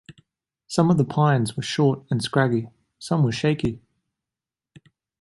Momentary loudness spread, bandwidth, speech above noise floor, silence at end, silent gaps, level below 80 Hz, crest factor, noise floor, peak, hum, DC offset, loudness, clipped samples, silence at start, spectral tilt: 9 LU; 11.5 kHz; 68 dB; 1.45 s; none; -54 dBFS; 20 dB; -89 dBFS; -4 dBFS; none; under 0.1%; -22 LUFS; under 0.1%; 0.1 s; -6.5 dB/octave